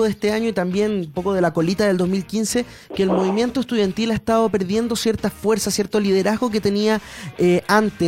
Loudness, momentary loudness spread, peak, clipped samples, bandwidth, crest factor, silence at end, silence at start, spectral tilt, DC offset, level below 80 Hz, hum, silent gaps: -20 LUFS; 4 LU; -2 dBFS; under 0.1%; 16.5 kHz; 18 dB; 0 s; 0 s; -5 dB/octave; under 0.1%; -48 dBFS; none; none